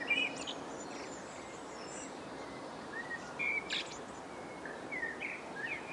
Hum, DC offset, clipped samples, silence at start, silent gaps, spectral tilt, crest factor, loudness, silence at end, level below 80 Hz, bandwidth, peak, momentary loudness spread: none; under 0.1%; under 0.1%; 0 s; none; -2.5 dB/octave; 20 dB; -40 LUFS; 0 s; -70 dBFS; 11.5 kHz; -22 dBFS; 12 LU